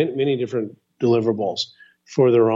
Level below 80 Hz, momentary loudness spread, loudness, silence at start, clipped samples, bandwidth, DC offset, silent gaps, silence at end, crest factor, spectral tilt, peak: -68 dBFS; 11 LU; -21 LUFS; 0 s; under 0.1%; 7.6 kHz; under 0.1%; none; 0 s; 16 dB; -6.5 dB/octave; -6 dBFS